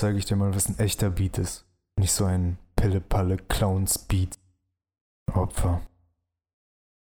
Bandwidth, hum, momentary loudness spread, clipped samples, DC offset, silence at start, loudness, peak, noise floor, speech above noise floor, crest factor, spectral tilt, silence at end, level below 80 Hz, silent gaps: 19.5 kHz; none; 9 LU; under 0.1%; under 0.1%; 0 s; -26 LUFS; -6 dBFS; -74 dBFS; 49 dB; 22 dB; -5 dB/octave; 1.25 s; -36 dBFS; 5.01-5.26 s